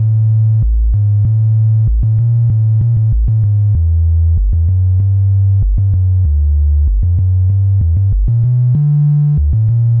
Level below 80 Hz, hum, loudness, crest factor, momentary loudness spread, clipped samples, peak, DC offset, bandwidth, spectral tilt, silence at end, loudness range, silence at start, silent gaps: -16 dBFS; none; -12 LUFS; 4 dB; 2 LU; under 0.1%; -6 dBFS; under 0.1%; 1.1 kHz; -15 dB/octave; 0 s; 1 LU; 0 s; none